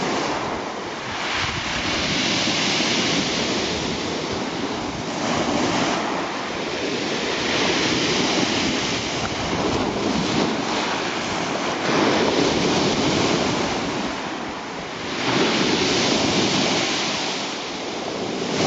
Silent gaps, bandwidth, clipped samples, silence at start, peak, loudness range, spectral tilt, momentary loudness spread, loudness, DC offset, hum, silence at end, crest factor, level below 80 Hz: none; 9 kHz; under 0.1%; 0 s; -6 dBFS; 2 LU; -3.5 dB/octave; 8 LU; -22 LUFS; under 0.1%; none; 0 s; 18 dB; -48 dBFS